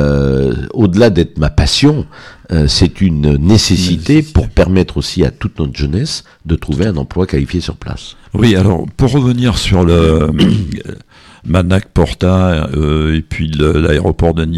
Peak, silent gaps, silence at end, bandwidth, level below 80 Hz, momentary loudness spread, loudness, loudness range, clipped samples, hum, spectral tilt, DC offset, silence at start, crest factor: 0 dBFS; none; 0 s; 13 kHz; -22 dBFS; 10 LU; -12 LUFS; 4 LU; under 0.1%; none; -6 dB/octave; under 0.1%; 0 s; 12 dB